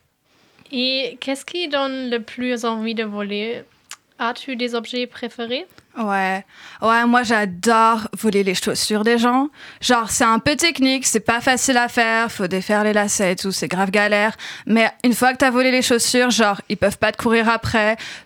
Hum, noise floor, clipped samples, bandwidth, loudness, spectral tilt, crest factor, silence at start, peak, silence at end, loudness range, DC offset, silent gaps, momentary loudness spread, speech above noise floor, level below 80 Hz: none; -59 dBFS; under 0.1%; 18 kHz; -18 LUFS; -3 dB/octave; 16 dB; 0.7 s; -4 dBFS; 0.05 s; 8 LU; under 0.1%; none; 10 LU; 40 dB; -52 dBFS